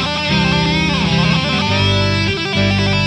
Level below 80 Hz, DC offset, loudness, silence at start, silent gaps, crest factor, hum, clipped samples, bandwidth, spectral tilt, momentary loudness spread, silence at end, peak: -32 dBFS; under 0.1%; -14 LUFS; 0 s; none; 14 dB; none; under 0.1%; 10 kHz; -5.5 dB/octave; 2 LU; 0 s; -2 dBFS